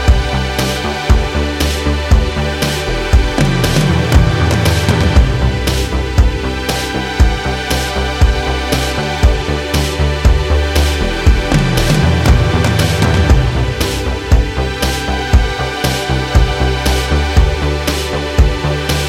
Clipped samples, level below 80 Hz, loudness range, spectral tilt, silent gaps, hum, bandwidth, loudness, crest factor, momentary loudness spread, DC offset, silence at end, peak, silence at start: under 0.1%; -16 dBFS; 2 LU; -5 dB/octave; none; none; 16 kHz; -14 LUFS; 12 dB; 5 LU; under 0.1%; 0 s; 0 dBFS; 0 s